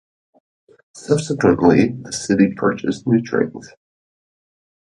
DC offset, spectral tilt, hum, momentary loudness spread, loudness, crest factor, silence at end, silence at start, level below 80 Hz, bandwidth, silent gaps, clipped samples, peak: under 0.1%; -6 dB/octave; none; 11 LU; -18 LUFS; 18 dB; 1.2 s; 0.95 s; -50 dBFS; 11.5 kHz; none; under 0.1%; 0 dBFS